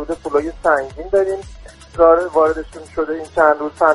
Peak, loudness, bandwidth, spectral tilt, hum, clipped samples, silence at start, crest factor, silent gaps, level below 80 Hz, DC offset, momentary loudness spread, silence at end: 0 dBFS; -17 LUFS; 11.5 kHz; -6 dB/octave; none; under 0.1%; 0 s; 16 dB; none; -40 dBFS; under 0.1%; 13 LU; 0 s